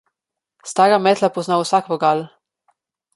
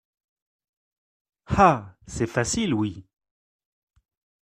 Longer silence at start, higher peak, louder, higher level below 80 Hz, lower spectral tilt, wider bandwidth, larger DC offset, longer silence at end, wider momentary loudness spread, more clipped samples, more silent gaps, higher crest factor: second, 0.65 s vs 1.5 s; about the same, -2 dBFS vs -4 dBFS; first, -17 LUFS vs -23 LUFS; second, -70 dBFS vs -48 dBFS; about the same, -4.5 dB/octave vs -5 dB/octave; second, 11.5 kHz vs 14 kHz; neither; second, 0.9 s vs 1.55 s; about the same, 13 LU vs 12 LU; neither; neither; second, 18 dB vs 24 dB